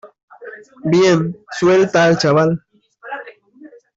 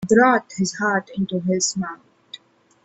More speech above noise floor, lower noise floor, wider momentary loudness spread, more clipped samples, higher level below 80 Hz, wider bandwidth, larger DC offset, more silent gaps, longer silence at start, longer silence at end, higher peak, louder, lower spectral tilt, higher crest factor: about the same, 29 dB vs 26 dB; about the same, -43 dBFS vs -46 dBFS; second, 20 LU vs 25 LU; neither; about the same, -56 dBFS vs -60 dBFS; about the same, 8 kHz vs 8.4 kHz; neither; first, 0.23-0.28 s vs none; about the same, 0.05 s vs 0 s; second, 0.3 s vs 0.5 s; about the same, -4 dBFS vs -4 dBFS; first, -15 LUFS vs -21 LUFS; first, -6 dB/octave vs -4 dB/octave; about the same, 14 dB vs 18 dB